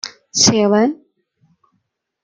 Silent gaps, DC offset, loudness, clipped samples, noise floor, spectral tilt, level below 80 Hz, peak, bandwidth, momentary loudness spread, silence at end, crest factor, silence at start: none; under 0.1%; -14 LUFS; under 0.1%; -70 dBFS; -3 dB/octave; -54 dBFS; 0 dBFS; 10.5 kHz; 12 LU; 1.3 s; 18 dB; 0.05 s